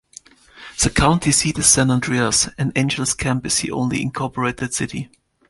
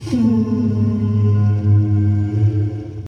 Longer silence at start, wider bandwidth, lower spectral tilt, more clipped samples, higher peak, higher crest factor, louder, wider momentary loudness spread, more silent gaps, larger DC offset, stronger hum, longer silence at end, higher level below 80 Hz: first, 0.55 s vs 0 s; first, 12 kHz vs 6 kHz; second, -3.5 dB/octave vs -10 dB/octave; neither; first, 0 dBFS vs -6 dBFS; first, 20 dB vs 10 dB; about the same, -18 LUFS vs -17 LUFS; first, 10 LU vs 3 LU; neither; neither; neither; first, 0.45 s vs 0 s; about the same, -38 dBFS vs -42 dBFS